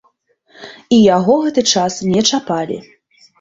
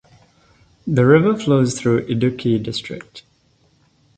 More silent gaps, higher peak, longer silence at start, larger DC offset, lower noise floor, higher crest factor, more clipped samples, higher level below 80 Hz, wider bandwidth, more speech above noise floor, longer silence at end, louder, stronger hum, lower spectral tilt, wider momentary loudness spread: neither; about the same, -2 dBFS vs 0 dBFS; second, 0.6 s vs 0.85 s; neither; about the same, -58 dBFS vs -59 dBFS; about the same, 14 dB vs 18 dB; neither; about the same, -54 dBFS vs -52 dBFS; second, 7.8 kHz vs 9.2 kHz; about the same, 45 dB vs 42 dB; second, 0.6 s vs 0.95 s; first, -14 LUFS vs -17 LUFS; neither; second, -4 dB/octave vs -6.5 dB/octave; second, 10 LU vs 17 LU